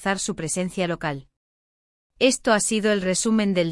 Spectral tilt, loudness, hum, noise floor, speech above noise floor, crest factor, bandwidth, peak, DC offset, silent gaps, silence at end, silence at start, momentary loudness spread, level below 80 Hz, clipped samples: -4 dB/octave; -22 LUFS; none; under -90 dBFS; over 68 dB; 20 dB; 12 kHz; -4 dBFS; under 0.1%; 1.36-2.10 s; 0 s; 0 s; 7 LU; -54 dBFS; under 0.1%